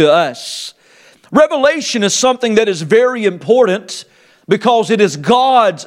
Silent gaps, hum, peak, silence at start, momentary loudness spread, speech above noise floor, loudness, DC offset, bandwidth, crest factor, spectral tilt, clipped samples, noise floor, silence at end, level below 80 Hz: none; none; 0 dBFS; 0 s; 13 LU; 34 dB; -13 LUFS; under 0.1%; 14.5 kHz; 14 dB; -4 dB/octave; under 0.1%; -47 dBFS; 0 s; -60 dBFS